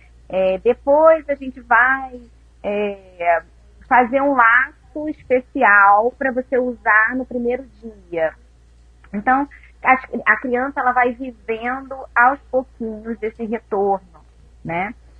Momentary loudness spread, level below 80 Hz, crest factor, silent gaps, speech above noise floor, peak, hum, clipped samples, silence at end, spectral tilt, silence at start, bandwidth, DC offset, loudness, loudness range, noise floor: 15 LU; -48 dBFS; 18 dB; none; 31 dB; 0 dBFS; none; under 0.1%; 0.25 s; -7.5 dB/octave; 0.3 s; 5.4 kHz; under 0.1%; -18 LUFS; 6 LU; -48 dBFS